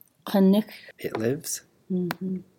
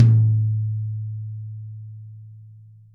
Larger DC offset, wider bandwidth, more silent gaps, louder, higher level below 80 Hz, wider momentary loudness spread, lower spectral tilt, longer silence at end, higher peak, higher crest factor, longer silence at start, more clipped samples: neither; first, 17 kHz vs 1.5 kHz; neither; second, -26 LUFS vs -23 LUFS; second, -70 dBFS vs -60 dBFS; second, 13 LU vs 24 LU; second, -6 dB/octave vs -11 dB/octave; second, 0.15 s vs 0.35 s; second, -10 dBFS vs -4 dBFS; about the same, 16 dB vs 18 dB; first, 0.25 s vs 0 s; neither